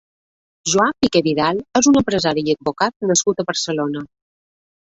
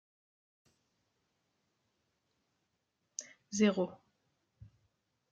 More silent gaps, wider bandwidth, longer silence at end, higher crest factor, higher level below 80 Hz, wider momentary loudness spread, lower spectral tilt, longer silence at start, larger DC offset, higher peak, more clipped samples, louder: first, 2.96-3.00 s vs none; about the same, 8.2 kHz vs 8.4 kHz; first, 0.8 s vs 0.65 s; second, 18 dB vs 24 dB; first, -52 dBFS vs -78 dBFS; second, 8 LU vs 16 LU; about the same, -3.5 dB/octave vs -4.5 dB/octave; second, 0.65 s vs 3.2 s; neither; first, -2 dBFS vs -16 dBFS; neither; first, -18 LUFS vs -35 LUFS